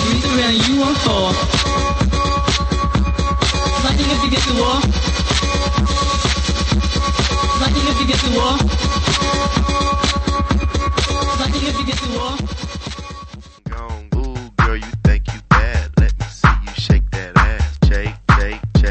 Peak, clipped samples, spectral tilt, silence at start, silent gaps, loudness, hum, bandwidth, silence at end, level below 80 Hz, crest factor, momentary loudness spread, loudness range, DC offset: 0 dBFS; under 0.1%; -4.5 dB/octave; 0 s; none; -17 LUFS; none; 8.8 kHz; 0 s; -20 dBFS; 16 dB; 8 LU; 5 LU; under 0.1%